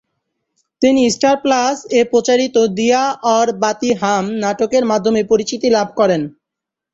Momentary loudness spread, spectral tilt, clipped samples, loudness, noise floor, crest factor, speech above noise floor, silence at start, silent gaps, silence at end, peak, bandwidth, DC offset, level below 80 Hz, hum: 4 LU; -4 dB/octave; under 0.1%; -15 LUFS; -83 dBFS; 14 dB; 68 dB; 0.8 s; none; 0.65 s; -2 dBFS; 8 kHz; under 0.1%; -56 dBFS; none